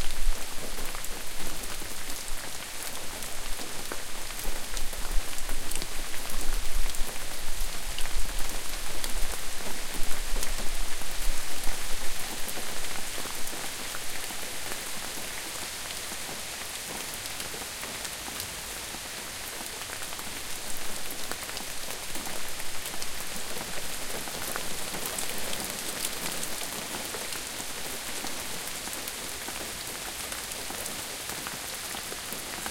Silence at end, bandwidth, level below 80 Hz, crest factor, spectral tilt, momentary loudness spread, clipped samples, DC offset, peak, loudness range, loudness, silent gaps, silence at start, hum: 0 s; 17 kHz; -36 dBFS; 16 dB; -1.5 dB/octave; 3 LU; under 0.1%; under 0.1%; -10 dBFS; 3 LU; -34 LUFS; none; 0 s; none